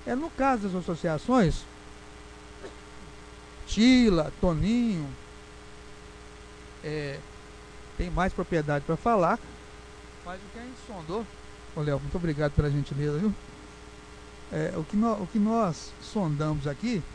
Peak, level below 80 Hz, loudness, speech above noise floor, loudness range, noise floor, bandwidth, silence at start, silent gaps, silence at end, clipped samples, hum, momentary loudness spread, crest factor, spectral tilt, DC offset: -10 dBFS; -42 dBFS; -28 LUFS; 19 dB; 7 LU; -46 dBFS; 10.5 kHz; 0 s; none; 0 s; under 0.1%; none; 23 LU; 20 dB; -6.5 dB/octave; under 0.1%